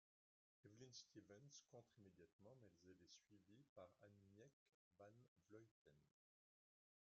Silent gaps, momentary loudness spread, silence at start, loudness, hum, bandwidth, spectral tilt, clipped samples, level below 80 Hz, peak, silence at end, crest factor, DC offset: 2.33-2.39 s, 3.69-3.76 s, 4.53-4.91 s, 5.28-5.36 s, 5.71-5.85 s; 6 LU; 0.65 s; -67 LUFS; none; 7 kHz; -4.5 dB/octave; under 0.1%; under -90 dBFS; -50 dBFS; 1.05 s; 22 dB; under 0.1%